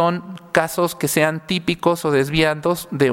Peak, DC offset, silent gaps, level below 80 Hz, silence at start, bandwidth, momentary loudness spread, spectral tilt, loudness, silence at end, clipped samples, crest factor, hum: 0 dBFS; under 0.1%; none; -48 dBFS; 0 s; 17 kHz; 4 LU; -4.5 dB/octave; -19 LUFS; 0 s; under 0.1%; 18 dB; none